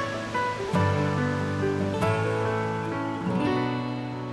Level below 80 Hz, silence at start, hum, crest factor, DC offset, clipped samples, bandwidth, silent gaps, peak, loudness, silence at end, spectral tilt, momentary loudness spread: -54 dBFS; 0 s; none; 14 dB; under 0.1%; under 0.1%; 12 kHz; none; -12 dBFS; -27 LUFS; 0 s; -7 dB/octave; 5 LU